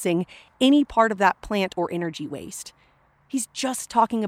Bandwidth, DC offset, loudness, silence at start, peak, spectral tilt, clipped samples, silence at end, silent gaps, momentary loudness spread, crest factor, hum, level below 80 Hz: 15.5 kHz; under 0.1%; -23 LUFS; 0 s; -4 dBFS; -4 dB/octave; under 0.1%; 0 s; none; 16 LU; 20 dB; none; -54 dBFS